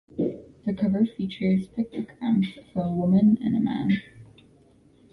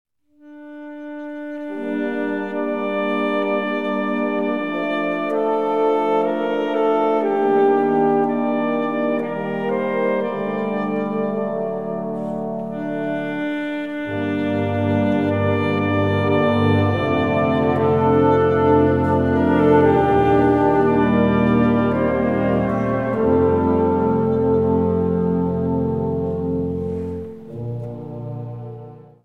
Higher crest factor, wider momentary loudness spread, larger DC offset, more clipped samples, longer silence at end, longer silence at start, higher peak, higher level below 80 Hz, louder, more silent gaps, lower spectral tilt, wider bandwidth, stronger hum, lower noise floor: about the same, 14 dB vs 16 dB; about the same, 11 LU vs 13 LU; second, under 0.1% vs 0.4%; neither; first, 0.9 s vs 0.2 s; second, 0.15 s vs 0.45 s; second, -10 dBFS vs -2 dBFS; second, -58 dBFS vs -44 dBFS; second, -25 LUFS vs -19 LUFS; neither; about the same, -9.5 dB/octave vs -9 dB/octave; second, 5 kHz vs 7 kHz; neither; first, -57 dBFS vs -46 dBFS